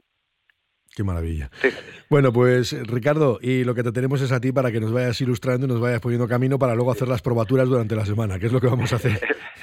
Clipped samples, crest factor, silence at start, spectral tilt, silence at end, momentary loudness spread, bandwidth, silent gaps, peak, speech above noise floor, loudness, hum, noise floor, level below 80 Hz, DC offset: under 0.1%; 16 dB; 0.95 s; -7 dB/octave; 0 s; 7 LU; 15 kHz; none; -6 dBFS; 47 dB; -22 LUFS; none; -68 dBFS; -48 dBFS; under 0.1%